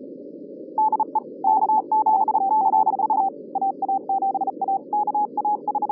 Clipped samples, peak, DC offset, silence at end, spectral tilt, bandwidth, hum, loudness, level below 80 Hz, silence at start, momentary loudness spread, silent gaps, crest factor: under 0.1%; -10 dBFS; under 0.1%; 0 s; -12 dB/octave; 1.3 kHz; none; -22 LUFS; under -90 dBFS; 0 s; 7 LU; none; 12 dB